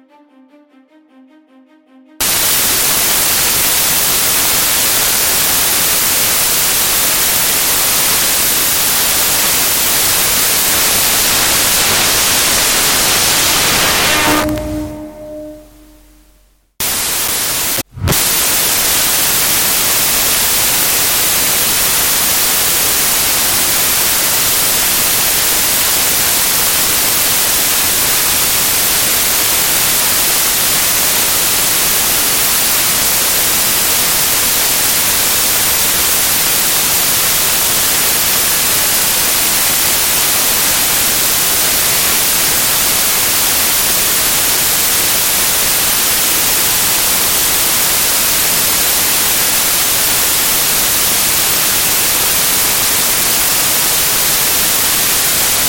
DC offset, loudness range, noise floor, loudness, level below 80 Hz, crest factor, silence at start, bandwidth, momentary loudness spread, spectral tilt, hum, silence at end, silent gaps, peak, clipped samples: under 0.1%; 2 LU; -51 dBFS; -9 LUFS; -36 dBFS; 12 dB; 2.2 s; 17 kHz; 1 LU; 0 dB/octave; none; 0 s; none; 0 dBFS; under 0.1%